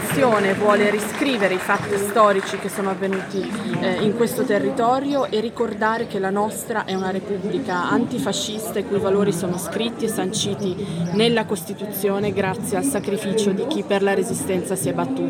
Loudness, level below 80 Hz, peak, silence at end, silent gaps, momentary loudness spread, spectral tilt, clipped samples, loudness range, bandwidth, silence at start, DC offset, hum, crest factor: -21 LUFS; -60 dBFS; -4 dBFS; 0 s; none; 7 LU; -4.5 dB/octave; under 0.1%; 3 LU; 17 kHz; 0 s; under 0.1%; none; 18 dB